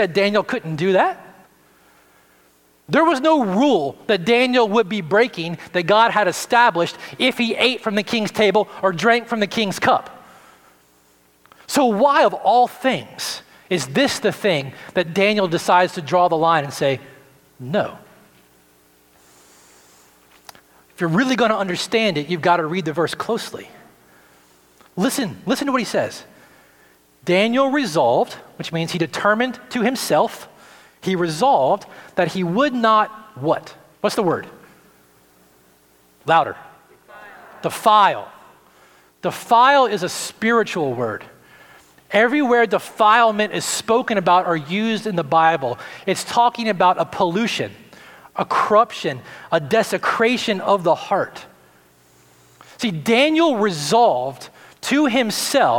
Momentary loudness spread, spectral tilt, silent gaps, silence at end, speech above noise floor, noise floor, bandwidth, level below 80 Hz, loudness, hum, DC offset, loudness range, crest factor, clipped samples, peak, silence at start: 11 LU; -4.5 dB/octave; none; 0 s; 38 dB; -56 dBFS; 18.5 kHz; -66 dBFS; -18 LUFS; none; under 0.1%; 7 LU; 18 dB; under 0.1%; -2 dBFS; 0 s